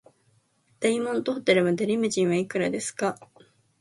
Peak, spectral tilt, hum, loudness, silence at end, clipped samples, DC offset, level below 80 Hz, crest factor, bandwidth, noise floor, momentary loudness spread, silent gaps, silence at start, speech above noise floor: -8 dBFS; -4.5 dB/octave; none; -25 LUFS; 0.55 s; under 0.1%; under 0.1%; -70 dBFS; 20 dB; 11.5 kHz; -66 dBFS; 7 LU; none; 0.8 s; 41 dB